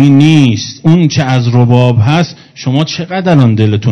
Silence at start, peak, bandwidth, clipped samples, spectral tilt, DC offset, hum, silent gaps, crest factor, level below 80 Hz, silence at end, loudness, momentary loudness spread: 0 s; 0 dBFS; 8.4 kHz; 4%; -7 dB/octave; under 0.1%; none; none; 8 dB; -46 dBFS; 0 s; -9 LUFS; 8 LU